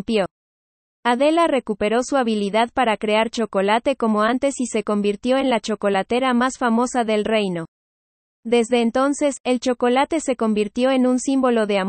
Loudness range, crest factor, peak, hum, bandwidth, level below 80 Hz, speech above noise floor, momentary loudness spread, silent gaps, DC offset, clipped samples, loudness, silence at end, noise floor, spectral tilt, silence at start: 2 LU; 14 dB; -6 dBFS; none; 8.8 kHz; -56 dBFS; over 71 dB; 4 LU; 0.31-1.03 s, 7.68-8.43 s, 9.40-9.44 s; under 0.1%; under 0.1%; -20 LUFS; 0 s; under -90 dBFS; -4.5 dB/octave; 0.1 s